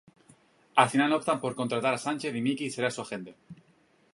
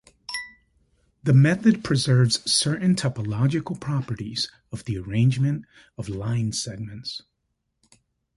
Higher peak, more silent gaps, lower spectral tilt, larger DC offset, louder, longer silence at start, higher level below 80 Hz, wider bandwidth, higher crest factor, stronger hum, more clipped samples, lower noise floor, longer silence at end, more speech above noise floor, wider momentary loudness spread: about the same, -6 dBFS vs -6 dBFS; neither; about the same, -4.5 dB/octave vs -5 dB/octave; neither; second, -28 LUFS vs -23 LUFS; first, 0.75 s vs 0.3 s; second, -76 dBFS vs -52 dBFS; about the same, 11.5 kHz vs 11.5 kHz; first, 24 dB vs 18 dB; neither; neither; second, -65 dBFS vs -76 dBFS; second, 0.6 s vs 1.15 s; second, 36 dB vs 54 dB; about the same, 13 LU vs 15 LU